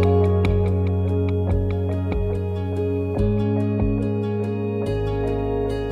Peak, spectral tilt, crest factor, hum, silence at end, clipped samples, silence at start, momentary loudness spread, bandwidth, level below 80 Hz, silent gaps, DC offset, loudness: -8 dBFS; -9.5 dB/octave; 14 dB; none; 0 s; under 0.1%; 0 s; 5 LU; 4.9 kHz; -32 dBFS; none; under 0.1%; -23 LUFS